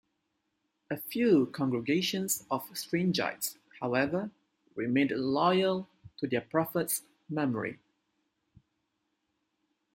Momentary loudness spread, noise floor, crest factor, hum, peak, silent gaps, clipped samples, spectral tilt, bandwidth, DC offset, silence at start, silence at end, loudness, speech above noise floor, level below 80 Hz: 12 LU; -80 dBFS; 20 dB; none; -12 dBFS; none; under 0.1%; -4.5 dB/octave; 16.5 kHz; under 0.1%; 0.9 s; 2.2 s; -31 LUFS; 51 dB; -72 dBFS